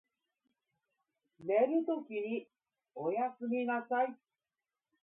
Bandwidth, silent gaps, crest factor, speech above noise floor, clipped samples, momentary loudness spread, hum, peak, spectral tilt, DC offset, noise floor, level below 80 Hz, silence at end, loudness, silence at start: 3.9 kHz; none; 18 dB; over 56 dB; under 0.1%; 10 LU; none; -18 dBFS; -0.5 dB/octave; under 0.1%; under -90 dBFS; under -90 dBFS; 0.85 s; -35 LUFS; 1.4 s